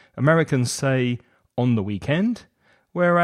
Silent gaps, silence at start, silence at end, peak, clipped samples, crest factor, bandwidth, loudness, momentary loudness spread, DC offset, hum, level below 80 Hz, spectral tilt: none; 0.15 s; 0 s; -4 dBFS; under 0.1%; 16 dB; 13.5 kHz; -22 LUFS; 14 LU; under 0.1%; none; -56 dBFS; -6 dB/octave